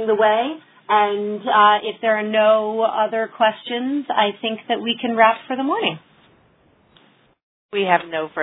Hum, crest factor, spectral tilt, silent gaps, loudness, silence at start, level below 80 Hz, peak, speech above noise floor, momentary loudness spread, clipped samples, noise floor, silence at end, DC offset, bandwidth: none; 20 dB; -8 dB/octave; 7.43-7.69 s; -19 LUFS; 0 s; -68 dBFS; 0 dBFS; 38 dB; 9 LU; under 0.1%; -57 dBFS; 0 s; under 0.1%; 4 kHz